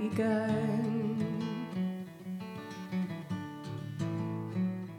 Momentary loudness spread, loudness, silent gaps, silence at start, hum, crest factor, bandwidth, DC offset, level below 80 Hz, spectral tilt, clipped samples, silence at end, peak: 11 LU; -35 LUFS; none; 0 s; none; 16 dB; 16.5 kHz; under 0.1%; -74 dBFS; -8 dB/octave; under 0.1%; 0 s; -18 dBFS